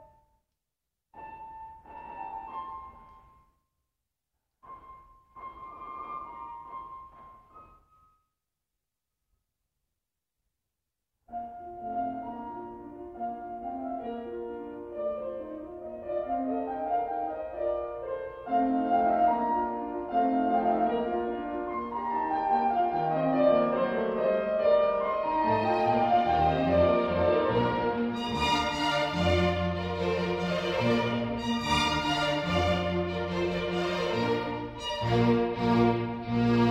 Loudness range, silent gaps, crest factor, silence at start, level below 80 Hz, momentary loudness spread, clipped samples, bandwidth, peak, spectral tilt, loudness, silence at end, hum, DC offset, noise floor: 19 LU; none; 18 dB; 0 s; -52 dBFS; 17 LU; under 0.1%; 13 kHz; -12 dBFS; -6 dB/octave; -28 LUFS; 0 s; none; under 0.1%; -87 dBFS